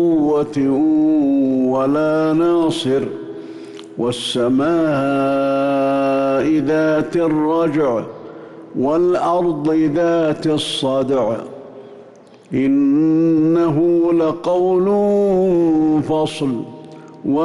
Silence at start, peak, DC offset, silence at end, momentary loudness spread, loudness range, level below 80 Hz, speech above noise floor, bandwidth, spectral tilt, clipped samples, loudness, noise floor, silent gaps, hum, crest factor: 0 s; -8 dBFS; under 0.1%; 0 s; 12 LU; 3 LU; -52 dBFS; 27 dB; 11.5 kHz; -6.5 dB/octave; under 0.1%; -16 LUFS; -43 dBFS; none; none; 8 dB